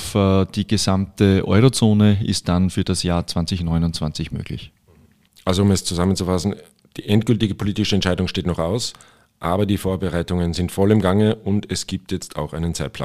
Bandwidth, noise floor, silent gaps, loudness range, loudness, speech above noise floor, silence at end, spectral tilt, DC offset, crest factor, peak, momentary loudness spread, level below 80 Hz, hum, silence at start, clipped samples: 15 kHz; -54 dBFS; none; 5 LU; -20 LUFS; 35 dB; 0 s; -6 dB/octave; 0.5%; 18 dB; -2 dBFS; 12 LU; -40 dBFS; none; 0 s; under 0.1%